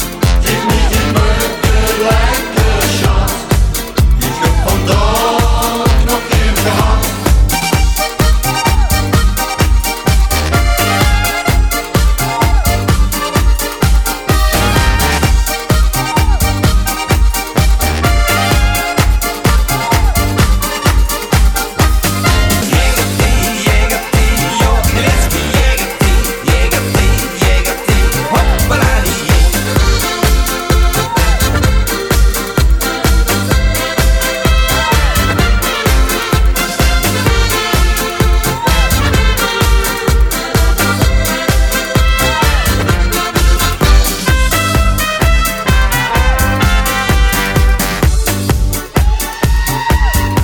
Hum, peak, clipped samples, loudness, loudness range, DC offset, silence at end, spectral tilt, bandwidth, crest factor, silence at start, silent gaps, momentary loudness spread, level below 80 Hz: none; 0 dBFS; under 0.1%; -12 LUFS; 1 LU; 0.2%; 0 s; -4 dB/octave; over 20 kHz; 10 dB; 0 s; none; 2 LU; -14 dBFS